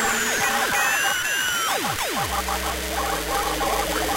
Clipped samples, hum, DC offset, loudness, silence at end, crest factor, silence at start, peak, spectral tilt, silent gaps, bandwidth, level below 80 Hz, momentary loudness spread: under 0.1%; none; under 0.1%; -22 LUFS; 0 s; 16 dB; 0 s; -8 dBFS; -1.5 dB/octave; none; 16 kHz; -38 dBFS; 5 LU